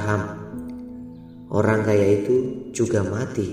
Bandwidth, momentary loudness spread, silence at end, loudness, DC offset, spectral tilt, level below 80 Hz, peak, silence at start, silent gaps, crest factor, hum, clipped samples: 13 kHz; 18 LU; 0 s; -22 LUFS; under 0.1%; -7 dB/octave; -54 dBFS; -4 dBFS; 0 s; none; 18 dB; none; under 0.1%